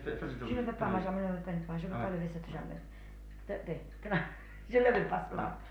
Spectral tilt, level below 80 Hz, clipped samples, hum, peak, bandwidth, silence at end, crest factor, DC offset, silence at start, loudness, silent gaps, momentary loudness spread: -8 dB/octave; -48 dBFS; under 0.1%; 50 Hz at -65 dBFS; -16 dBFS; 10.5 kHz; 0 s; 20 dB; under 0.1%; 0 s; -35 LUFS; none; 18 LU